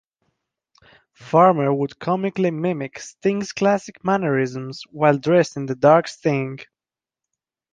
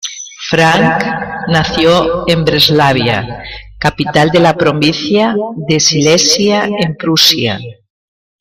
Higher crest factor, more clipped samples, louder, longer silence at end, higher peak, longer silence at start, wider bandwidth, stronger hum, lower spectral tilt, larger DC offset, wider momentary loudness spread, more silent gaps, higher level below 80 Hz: first, 20 dB vs 12 dB; neither; second, -20 LUFS vs -10 LUFS; first, 1.1 s vs 0.65 s; about the same, -2 dBFS vs 0 dBFS; first, 1.2 s vs 0.05 s; second, 9.6 kHz vs 16.5 kHz; neither; first, -6.5 dB/octave vs -4 dB/octave; neither; about the same, 12 LU vs 10 LU; neither; second, -64 dBFS vs -38 dBFS